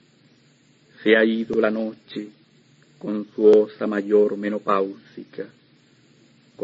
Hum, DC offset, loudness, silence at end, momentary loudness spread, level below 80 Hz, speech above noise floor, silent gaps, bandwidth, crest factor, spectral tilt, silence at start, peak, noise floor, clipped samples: none; under 0.1%; -21 LUFS; 0 s; 21 LU; -68 dBFS; 37 dB; none; 7.4 kHz; 20 dB; -7 dB/octave; 1.05 s; -4 dBFS; -57 dBFS; under 0.1%